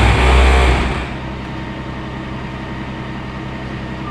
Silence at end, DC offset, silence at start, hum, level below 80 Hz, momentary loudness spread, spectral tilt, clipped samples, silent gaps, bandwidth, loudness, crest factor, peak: 0 s; under 0.1%; 0 s; none; -20 dBFS; 14 LU; -6 dB/octave; under 0.1%; none; 11 kHz; -19 LUFS; 16 dB; 0 dBFS